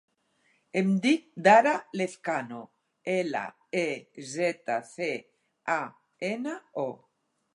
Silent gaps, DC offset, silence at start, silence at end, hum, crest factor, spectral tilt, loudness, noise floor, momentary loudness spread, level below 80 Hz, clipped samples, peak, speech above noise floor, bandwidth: none; under 0.1%; 0.75 s; 0.6 s; none; 22 dB; -5.5 dB/octave; -28 LUFS; -75 dBFS; 17 LU; -84 dBFS; under 0.1%; -8 dBFS; 47 dB; 11.5 kHz